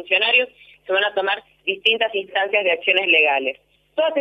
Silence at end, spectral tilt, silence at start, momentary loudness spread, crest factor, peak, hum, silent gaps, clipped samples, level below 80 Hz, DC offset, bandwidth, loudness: 0 s; -3.5 dB/octave; 0 s; 12 LU; 16 dB; -4 dBFS; 50 Hz at -65 dBFS; none; under 0.1%; -70 dBFS; under 0.1%; 6.4 kHz; -18 LUFS